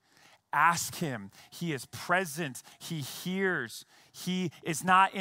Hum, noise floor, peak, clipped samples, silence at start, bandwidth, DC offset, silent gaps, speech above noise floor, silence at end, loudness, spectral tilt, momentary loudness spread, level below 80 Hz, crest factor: none; -62 dBFS; -10 dBFS; under 0.1%; 0.55 s; 16 kHz; under 0.1%; none; 31 dB; 0 s; -31 LUFS; -4 dB/octave; 16 LU; -74 dBFS; 22 dB